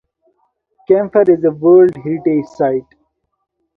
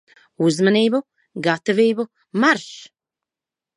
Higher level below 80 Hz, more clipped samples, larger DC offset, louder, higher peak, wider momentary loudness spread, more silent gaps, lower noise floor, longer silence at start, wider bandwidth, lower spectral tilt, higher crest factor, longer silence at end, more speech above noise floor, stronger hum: first, -58 dBFS vs -72 dBFS; neither; neither; first, -13 LUFS vs -19 LUFS; about the same, 0 dBFS vs -2 dBFS; second, 8 LU vs 14 LU; neither; second, -65 dBFS vs -89 dBFS; first, 0.9 s vs 0.4 s; second, 2.7 kHz vs 11 kHz; first, -10 dB/octave vs -5 dB/octave; about the same, 14 dB vs 18 dB; about the same, 0.95 s vs 0.95 s; second, 53 dB vs 70 dB; neither